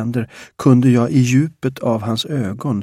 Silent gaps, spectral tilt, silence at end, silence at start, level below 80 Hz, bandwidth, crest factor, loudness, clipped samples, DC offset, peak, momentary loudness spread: none; -7 dB/octave; 0 s; 0 s; -54 dBFS; 14 kHz; 16 dB; -17 LUFS; under 0.1%; under 0.1%; 0 dBFS; 10 LU